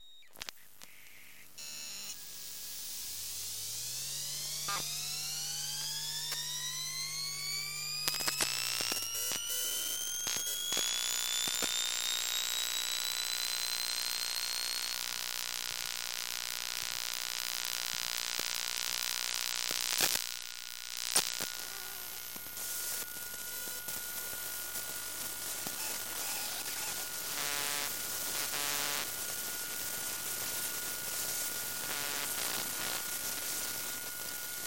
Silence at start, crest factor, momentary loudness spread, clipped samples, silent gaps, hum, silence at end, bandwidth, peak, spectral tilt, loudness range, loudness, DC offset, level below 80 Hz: 0 s; 32 dB; 9 LU; under 0.1%; none; 50 Hz at -65 dBFS; 0 s; 17 kHz; -6 dBFS; 1 dB/octave; 6 LU; -34 LUFS; 0.2%; -70 dBFS